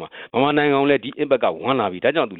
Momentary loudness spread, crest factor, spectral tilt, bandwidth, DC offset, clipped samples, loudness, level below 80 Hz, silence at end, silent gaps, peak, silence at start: 4 LU; 16 dB; -9.5 dB/octave; 4.4 kHz; under 0.1%; under 0.1%; -19 LUFS; -60 dBFS; 0 s; none; -4 dBFS; 0 s